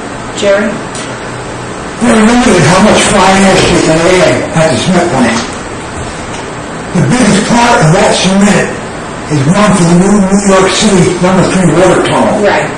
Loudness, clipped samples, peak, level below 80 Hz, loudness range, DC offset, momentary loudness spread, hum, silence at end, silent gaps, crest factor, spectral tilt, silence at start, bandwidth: -7 LUFS; 2%; 0 dBFS; -30 dBFS; 4 LU; 0.5%; 14 LU; none; 0 s; none; 8 dB; -5 dB/octave; 0 s; 12 kHz